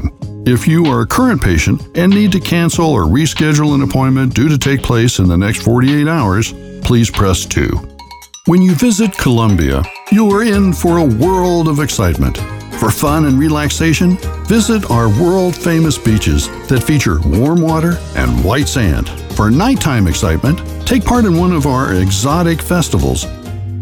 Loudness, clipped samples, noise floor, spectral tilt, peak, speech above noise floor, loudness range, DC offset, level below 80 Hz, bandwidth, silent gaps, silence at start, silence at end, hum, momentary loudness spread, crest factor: -12 LUFS; under 0.1%; -34 dBFS; -5.5 dB/octave; 0 dBFS; 23 dB; 2 LU; under 0.1%; -24 dBFS; 19.5 kHz; none; 0 s; 0 s; none; 6 LU; 10 dB